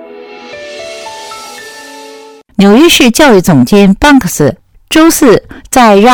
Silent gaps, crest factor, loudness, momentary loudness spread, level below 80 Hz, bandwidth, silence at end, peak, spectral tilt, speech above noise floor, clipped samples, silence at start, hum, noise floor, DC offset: none; 8 dB; -6 LUFS; 22 LU; -32 dBFS; over 20 kHz; 0 s; 0 dBFS; -4.5 dB/octave; 28 dB; 3%; 0 s; none; -32 dBFS; under 0.1%